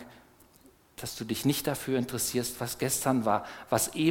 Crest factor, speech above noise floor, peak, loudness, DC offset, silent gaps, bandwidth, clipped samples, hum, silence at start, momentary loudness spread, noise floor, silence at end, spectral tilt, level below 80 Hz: 20 dB; 30 dB; -10 dBFS; -30 LUFS; under 0.1%; none; 18 kHz; under 0.1%; none; 0 s; 11 LU; -60 dBFS; 0 s; -4 dB/octave; -60 dBFS